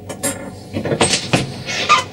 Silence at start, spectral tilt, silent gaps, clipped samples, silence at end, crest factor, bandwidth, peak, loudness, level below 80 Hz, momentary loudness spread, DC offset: 0 s; -3 dB/octave; none; under 0.1%; 0 s; 18 dB; 16.5 kHz; 0 dBFS; -18 LUFS; -48 dBFS; 12 LU; under 0.1%